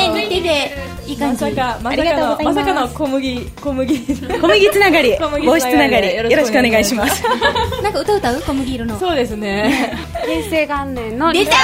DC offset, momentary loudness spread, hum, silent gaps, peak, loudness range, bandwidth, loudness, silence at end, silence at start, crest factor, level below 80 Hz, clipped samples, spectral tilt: under 0.1%; 10 LU; none; none; 0 dBFS; 5 LU; 16 kHz; -15 LUFS; 0 s; 0 s; 14 dB; -34 dBFS; under 0.1%; -4 dB/octave